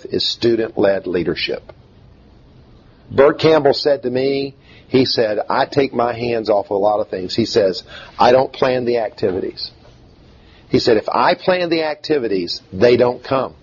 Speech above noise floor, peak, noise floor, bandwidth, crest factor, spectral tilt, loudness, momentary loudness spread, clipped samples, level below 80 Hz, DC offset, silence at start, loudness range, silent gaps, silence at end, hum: 29 dB; 0 dBFS; -46 dBFS; 7.4 kHz; 16 dB; -5.5 dB/octave; -17 LUFS; 9 LU; under 0.1%; -50 dBFS; under 0.1%; 0.05 s; 2 LU; none; 0.1 s; none